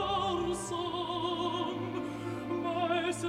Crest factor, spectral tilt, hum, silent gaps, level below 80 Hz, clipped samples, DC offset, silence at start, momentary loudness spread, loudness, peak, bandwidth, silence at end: 14 dB; -4.5 dB/octave; none; none; -58 dBFS; under 0.1%; under 0.1%; 0 s; 6 LU; -34 LUFS; -18 dBFS; 14 kHz; 0 s